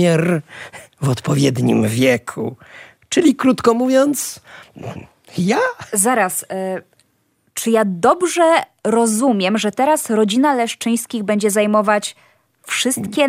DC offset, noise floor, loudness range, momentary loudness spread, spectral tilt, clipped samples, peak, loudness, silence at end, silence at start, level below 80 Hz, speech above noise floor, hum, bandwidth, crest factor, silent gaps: under 0.1%; -63 dBFS; 3 LU; 14 LU; -4.5 dB/octave; under 0.1%; -2 dBFS; -17 LUFS; 0 s; 0 s; -58 dBFS; 46 dB; none; 16 kHz; 14 dB; none